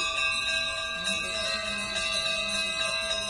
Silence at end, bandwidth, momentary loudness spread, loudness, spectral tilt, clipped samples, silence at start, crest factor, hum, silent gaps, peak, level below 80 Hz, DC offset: 0 s; 11.5 kHz; 4 LU; -27 LUFS; -0.5 dB/octave; under 0.1%; 0 s; 14 dB; none; none; -16 dBFS; -52 dBFS; under 0.1%